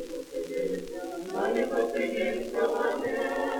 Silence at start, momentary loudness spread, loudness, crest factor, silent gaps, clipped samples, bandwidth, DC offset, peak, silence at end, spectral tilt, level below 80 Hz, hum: 0 s; 9 LU; -30 LUFS; 16 dB; none; under 0.1%; 19 kHz; under 0.1%; -14 dBFS; 0 s; -4.5 dB/octave; -58 dBFS; none